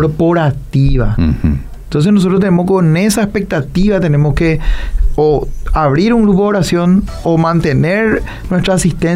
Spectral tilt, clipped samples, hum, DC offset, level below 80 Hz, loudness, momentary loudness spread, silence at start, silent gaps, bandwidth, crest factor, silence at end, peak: -7 dB/octave; under 0.1%; none; under 0.1%; -20 dBFS; -13 LUFS; 7 LU; 0 s; none; 15.5 kHz; 10 dB; 0 s; -2 dBFS